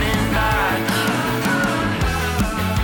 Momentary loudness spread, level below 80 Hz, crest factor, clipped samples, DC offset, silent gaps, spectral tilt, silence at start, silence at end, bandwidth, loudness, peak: 2 LU; -30 dBFS; 10 dB; under 0.1%; under 0.1%; none; -5 dB/octave; 0 s; 0 s; over 20 kHz; -19 LUFS; -8 dBFS